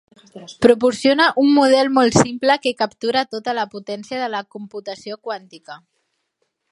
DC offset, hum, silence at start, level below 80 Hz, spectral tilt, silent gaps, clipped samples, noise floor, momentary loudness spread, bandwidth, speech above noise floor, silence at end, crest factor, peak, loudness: under 0.1%; none; 0.35 s; -56 dBFS; -4.5 dB/octave; none; under 0.1%; -72 dBFS; 17 LU; 11.5 kHz; 54 dB; 0.95 s; 18 dB; 0 dBFS; -17 LUFS